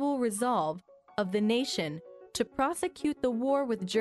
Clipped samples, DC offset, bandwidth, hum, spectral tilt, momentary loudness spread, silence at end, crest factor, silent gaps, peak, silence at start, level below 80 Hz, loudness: under 0.1%; under 0.1%; 12 kHz; none; -4.5 dB/octave; 10 LU; 0 s; 16 dB; none; -14 dBFS; 0 s; -64 dBFS; -31 LUFS